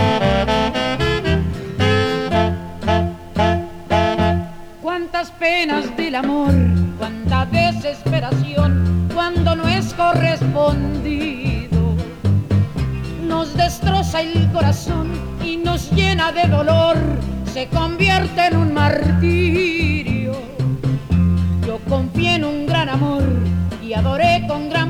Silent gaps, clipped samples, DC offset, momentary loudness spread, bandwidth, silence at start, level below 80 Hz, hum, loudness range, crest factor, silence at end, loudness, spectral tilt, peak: none; under 0.1%; under 0.1%; 7 LU; 14 kHz; 0 s; -30 dBFS; none; 3 LU; 14 dB; 0 s; -18 LUFS; -6.5 dB/octave; -2 dBFS